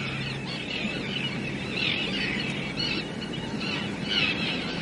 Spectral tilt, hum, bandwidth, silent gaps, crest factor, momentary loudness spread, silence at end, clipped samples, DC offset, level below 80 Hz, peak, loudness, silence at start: -4.5 dB/octave; none; 11.5 kHz; none; 16 dB; 7 LU; 0 s; under 0.1%; under 0.1%; -52 dBFS; -12 dBFS; -28 LUFS; 0 s